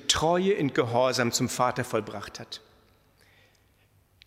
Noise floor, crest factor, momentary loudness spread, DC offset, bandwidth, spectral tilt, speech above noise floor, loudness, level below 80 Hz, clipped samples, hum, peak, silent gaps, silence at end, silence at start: -64 dBFS; 22 dB; 16 LU; under 0.1%; 16 kHz; -3.5 dB/octave; 37 dB; -26 LUFS; -58 dBFS; under 0.1%; none; -8 dBFS; none; 1.7 s; 0 s